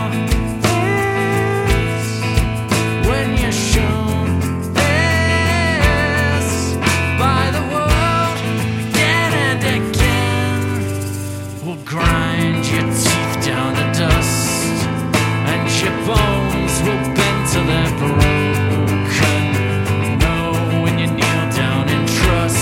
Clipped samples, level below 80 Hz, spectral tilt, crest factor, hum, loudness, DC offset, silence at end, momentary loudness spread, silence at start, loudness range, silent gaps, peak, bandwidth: under 0.1%; -26 dBFS; -5 dB/octave; 16 dB; none; -16 LUFS; under 0.1%; 0 s; 4 LU; 0 s; 2 LU; none; 0 dBFS; 17 kHz